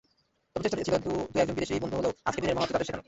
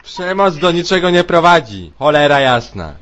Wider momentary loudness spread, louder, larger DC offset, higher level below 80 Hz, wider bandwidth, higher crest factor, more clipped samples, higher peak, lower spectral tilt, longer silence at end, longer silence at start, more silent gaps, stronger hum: second, 3 LU vs 8 LU; second, -30 LUFS vs -12 LUFS; neither; second, -54 dBFS vs -40 dBFS; second, 8.2 kHz vs 9.2 kHz; first, 20 dB vs 12 dB; neither; second, -10 dBFS vs 0 dBFS; about the same, -5 dB/octave vs -5 dB/octave; about the same, 0.05 s vs 0.05 s; first, 0.55 s vs 0.05 s; neither; neither